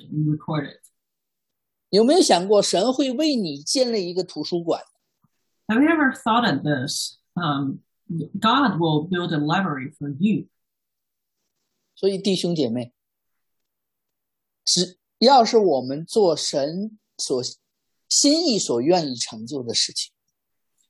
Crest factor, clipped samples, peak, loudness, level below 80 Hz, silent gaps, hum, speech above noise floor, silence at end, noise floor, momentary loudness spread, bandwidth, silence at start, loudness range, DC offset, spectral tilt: 20 dB; under 0.1%; -4 dBFS; -21 LUFS; -70 dBFS; none; none; 62 dB; 0.85 s; -83 dBFS; 13 LU; 12.5 kHz; 0.1 s; 6 LU; under 0.1%; -4 dB/octave